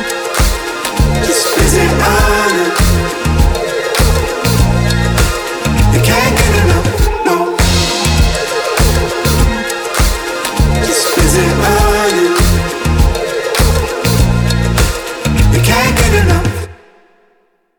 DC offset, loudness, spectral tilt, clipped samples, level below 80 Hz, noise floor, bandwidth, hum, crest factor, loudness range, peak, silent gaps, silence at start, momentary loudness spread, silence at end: under 0.1%; -12 LUFS; -4.5 dB/octave; under 0.1%; -16 dBFS; -55 dBFS; over 20 kHz; none; 12 dB; 1 LU; 0 dBFS; none; 0 s; 5 LU; 1.05 s